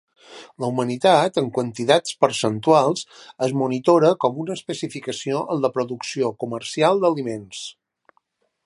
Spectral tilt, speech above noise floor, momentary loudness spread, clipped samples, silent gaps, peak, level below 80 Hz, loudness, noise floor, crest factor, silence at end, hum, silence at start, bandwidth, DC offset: -5 dB/octave; 47 dB; 12 LU; under 0.1%; none; -2 dBFS; -68 dBFS; -21 LUFS; -67 dBFS; 20 dB; 0.95 s; none; 0.3 s; 11.5 kHz; under 0.1%